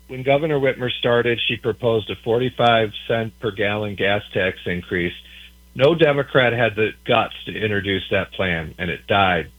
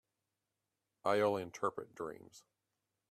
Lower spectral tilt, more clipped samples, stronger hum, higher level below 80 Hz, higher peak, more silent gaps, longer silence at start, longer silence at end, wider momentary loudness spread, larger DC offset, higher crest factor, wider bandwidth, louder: first, -7 dB/octave vs -5 dB/octave; neither; neither; first, -48 dBFS vs -80 dBFS; first, 0 dBFS vs -20 dBFS; neither; second, 0.1 s vs 1.05 s; second, 0.1 s vs 0.7 s; second, 8 LU vs 13 LU; neither; about the same, 20 dB vs 22 dB; first, 19.5 kHz vs 14 kHz; first, -20 LUFS vs -38 LUFS